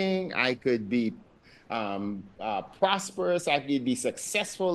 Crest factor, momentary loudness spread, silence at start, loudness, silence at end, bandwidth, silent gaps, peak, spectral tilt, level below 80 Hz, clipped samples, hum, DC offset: 20 dB; 7 LU; 0 s; -29 LUFS; 0 s; 12.5 kHz; none; -8 dBFS; -4 dB/octave; -66 dBFS; under 0.1%; none; under 0.1%